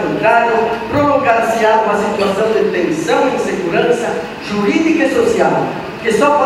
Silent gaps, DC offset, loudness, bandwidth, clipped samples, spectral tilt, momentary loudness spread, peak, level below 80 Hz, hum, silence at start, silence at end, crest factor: none; under 0.1%; -14 LUFS; 15.5 kHz; under 0.1%; -5 dB/octave; 6 LU; 0 dBFS; -46 dBFS; none; 0 s; 0 s; 14 dB